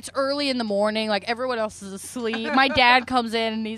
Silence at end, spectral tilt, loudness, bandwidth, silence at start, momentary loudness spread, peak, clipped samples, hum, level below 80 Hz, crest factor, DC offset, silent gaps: 0 s; -3.5 dB/octave; -22 LUFS; 13.5 kHz; 0.05 s; 13 LU; -2 dBFS; under 0.1%; none; -56 dBFS; 20 dB; under 0.1%; none